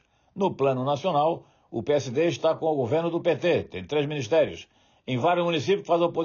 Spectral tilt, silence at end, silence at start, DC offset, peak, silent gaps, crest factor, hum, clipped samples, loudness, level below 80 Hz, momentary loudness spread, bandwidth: -5 dB/octave; 0 s; 0.35 s; under 0.1%; -12 dBFS; none; 14 dB; none; under 0.1%; -25 LUFS; -66 dBFS; 9 LU; 7 kHz